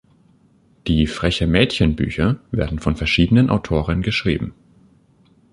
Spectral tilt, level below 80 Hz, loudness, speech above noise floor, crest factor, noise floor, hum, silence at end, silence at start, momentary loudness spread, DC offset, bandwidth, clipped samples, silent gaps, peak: -6.5 dB/octave; -32 dBFS; -19 LUFS; 37 dB; 18 dB; -55 dBFS; none; 1 s; 0.85 s; 8 LU; under 0.1%; 11.5 kHz; under 0.1%; none; -2 dBFS